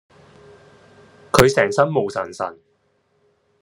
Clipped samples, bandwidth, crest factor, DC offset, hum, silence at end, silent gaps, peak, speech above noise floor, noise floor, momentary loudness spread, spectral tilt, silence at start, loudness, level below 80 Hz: under 0.1%; 13 kHz; 22 dB; under 0.1%; none; 1.1 s; none; 0 dBFS; 46 dB; -65 dBFS; 14 LU; -4.5 dB/octave; 1.35 s; -18 LUFS; -46 dBFS